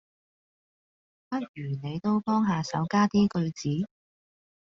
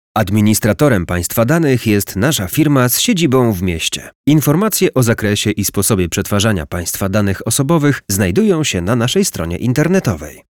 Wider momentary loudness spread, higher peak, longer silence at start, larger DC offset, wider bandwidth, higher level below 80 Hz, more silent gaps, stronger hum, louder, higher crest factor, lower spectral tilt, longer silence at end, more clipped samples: first, 11 LU vs 5 LU; second, -12 dBFS vs -2 dBFS; first, 1.3 s vs 0.15 s; neither; second, 7.6 kHz vs 19.5 kHz; second, -64 dBFS vs -38 dBFS; about the same, 1.48-1.54 s vs 4.15-4.24 s; neither; second, -28 LUFS vs -14 LUFS; first, 18 dB vs 12 dB; first, -6.5 dB/octave vs -5 dB/octave; first, 0.8 s vs 0.2 s; neither